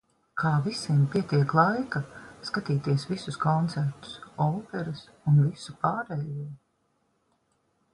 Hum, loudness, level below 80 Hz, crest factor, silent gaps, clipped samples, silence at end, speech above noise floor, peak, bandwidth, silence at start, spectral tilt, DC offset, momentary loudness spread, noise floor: none; -27 LUFS; -62 dBFS; 20 dB; none; under 0.1%; 1.35 s; 45 dB; -8 dBFS; 11 kHz; 0.35 s; -7 dB/octave; under 0.1%; 14 LU; -72 dBFS